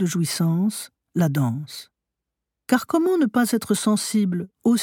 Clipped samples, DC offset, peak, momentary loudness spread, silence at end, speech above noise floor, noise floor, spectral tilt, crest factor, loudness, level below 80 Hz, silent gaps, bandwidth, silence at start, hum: under 0.1%; under 0.1%; -4 dBFS; 12 LU; 0 s; 63 dB; -84 dBFS; -5.5 dB/octave; 18 dB; -22 LUFS; -68 dBFS; none; 18.5 kHz; 0 s; none